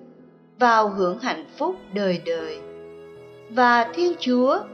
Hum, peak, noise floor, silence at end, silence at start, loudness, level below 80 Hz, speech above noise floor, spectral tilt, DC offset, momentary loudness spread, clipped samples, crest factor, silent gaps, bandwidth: none; -6 dBFS; -50 dBFS; 0 s; 0.6 s; -22 LUFS; -68 dBFS; 29 dB; -5.5 dB/octave; under 0.1%; 17 LU; under 0.1%; 18 dB; none; 6.6 kHz